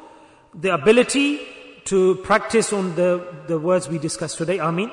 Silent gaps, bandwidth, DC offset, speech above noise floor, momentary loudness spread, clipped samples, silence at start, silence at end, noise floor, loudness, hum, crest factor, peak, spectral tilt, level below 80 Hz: none; 11 kHz; under 0.1%; 28 dB; 10 LU; under 0.1%; 0 s; 0 s; -48 dBFS; -20 LUFS; none; 16 dB; -4 dBFS; -4.5 dB/octave; -56 dBFS